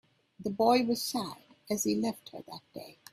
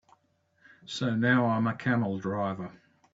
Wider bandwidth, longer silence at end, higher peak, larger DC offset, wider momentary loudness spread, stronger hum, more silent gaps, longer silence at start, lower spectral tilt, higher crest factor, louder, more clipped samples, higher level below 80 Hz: first, 16 kHz vs 7.8 kHz; second, 0.2 s vs 0.45 s; about the same, -12 dBFS vs -10 dBFS; neither; first, 20 LU vs 15 LU; neither; neither; second, 0.4 s vs 0.85 s; second, -4 dB/octave vs -7 dB/octave; about the same, 20 dB vs 18 dB; about the same, -31 LUFS vs -29 LUFS; neither; about the same, -72 dBFS vs -68 dBFS